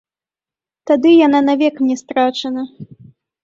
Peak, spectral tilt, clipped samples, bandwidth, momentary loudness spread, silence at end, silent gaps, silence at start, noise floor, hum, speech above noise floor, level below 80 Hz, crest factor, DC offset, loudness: -2 dBFS; -5 dB/octave; under 0.1%; 7.6 kHz; 15 LU; 0.6 s; none; 0.85 s; under -90 dBFS; none; over 76 dB; -64 dBFS; 14 dB; under 0.1%; -14 LUFS